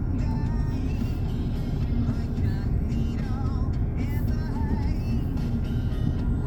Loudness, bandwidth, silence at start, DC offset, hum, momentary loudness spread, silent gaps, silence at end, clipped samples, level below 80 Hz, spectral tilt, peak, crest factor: -28 LUFS; 18.5 kHz; 0 s; under 0.1%; none; 2 LU; none; 0 s; under 0.1%; -28 dBFS; -9 dB/octave; -12 dBFS; 12 dB